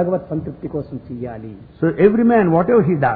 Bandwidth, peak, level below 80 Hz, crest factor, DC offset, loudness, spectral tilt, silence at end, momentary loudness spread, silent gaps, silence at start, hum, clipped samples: 4.6 kHz; 0 dBFS; -46 dBFS; 16 dB; under 0.1%; -17 LUFS; -13 dB/octave; 0 s; 16 LU; none; 0 s; none; under 0.1%